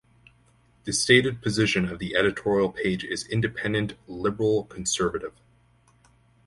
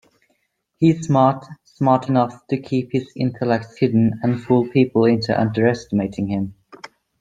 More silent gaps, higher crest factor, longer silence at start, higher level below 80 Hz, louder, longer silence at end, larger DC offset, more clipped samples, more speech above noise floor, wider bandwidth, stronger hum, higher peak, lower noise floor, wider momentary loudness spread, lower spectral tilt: neither; about the same, 22 dB vs 18 dB; about the same, 0.85 s vs 0.8 s; about the same, -52 dBFS vs -56 dBFS; second, -25 LUFS vs -19 LUFS; first, 1.15 s vs 0.7 s; neither; neither; second, 36 dB vs 50 dB; first, 11.5 kHz vs 9.2 kHz; neither; about the same, -4 dBFS vs -2 dBFS; second, -61 dBFS vs -68 dBFS; first, 11 LU vs 8 LU; second, -4 dB/octave vs -8 dB/octave